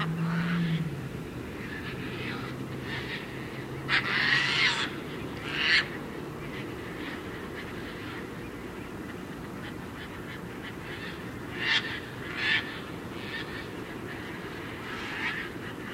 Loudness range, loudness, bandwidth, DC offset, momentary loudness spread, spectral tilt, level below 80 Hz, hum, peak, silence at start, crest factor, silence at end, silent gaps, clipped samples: 12 LU; -32 LUFS; 16 kHz; under 0.1%; 15 LU; -4.5 dB/octave; -54 dBFS; none; -10 dBFS; 0 s; 22 dB; 0 s; none; under 0.1%